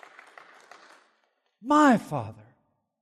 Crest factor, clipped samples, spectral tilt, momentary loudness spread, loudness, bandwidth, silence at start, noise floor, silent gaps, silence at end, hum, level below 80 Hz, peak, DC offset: 18 dB; under 0.1%; -6 dB/octave; 22 LU; -23 LUFS; 13 kHz; 1.65 s; -72 dBFS; none; 0.7 s; none; -72 dBFS; -10 dBFS; under 0.1%